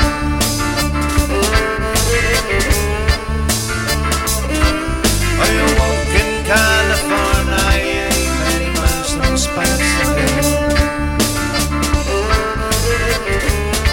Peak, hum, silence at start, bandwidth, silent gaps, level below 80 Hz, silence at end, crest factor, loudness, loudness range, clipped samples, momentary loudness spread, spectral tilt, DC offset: 0 dBFS; none; 0 s; 17 kHz; none; -20 dBFS; 0 s; 14 dB; -15 LUFS; 2 LU; under 0.1%; 3 LU; -4 dB/octave; under 0.1%